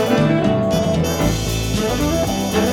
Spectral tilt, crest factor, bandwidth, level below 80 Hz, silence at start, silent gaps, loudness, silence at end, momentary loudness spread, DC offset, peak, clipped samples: -5.5 dB/octave; 14 dB; 18 kHz; -30 dBFS; 0 s; none; -18 LUFS; 0 s; 4 LU; under 0.1%; -4 dBFS; under 0.1%